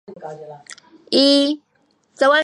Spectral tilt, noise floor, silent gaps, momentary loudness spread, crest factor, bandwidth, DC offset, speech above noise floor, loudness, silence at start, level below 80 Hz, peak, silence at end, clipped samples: -2.5 dB/octave; -60 dBFS; none; 23 LU; 18 dB; 11 kHz; under 0.1%; 43 dB; -16 LUFS; 0.1 s; -74 dBFS; -2 dBFS; 0 s; under 0.1%